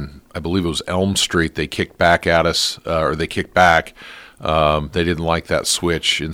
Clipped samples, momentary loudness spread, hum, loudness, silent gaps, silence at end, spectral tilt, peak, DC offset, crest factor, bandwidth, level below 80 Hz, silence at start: under 0.1%; 10 LU; none; -18 LUFS; none; 0 s; -3.5 dB/octave; 0 dBFS; under 0.1%; 18 dB; 17 kHz; -40 dBFS; 0 s